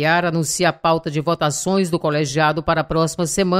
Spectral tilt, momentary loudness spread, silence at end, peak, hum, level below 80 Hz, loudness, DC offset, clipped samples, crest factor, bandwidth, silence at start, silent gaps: -4.5 dB/octave; 3 LU; 0 s; -4 dBFS; none; -44 dBFS; -19 LUFS; under 0.1%; under 0.1%; 16 dB; 16 kHz; 0 s; none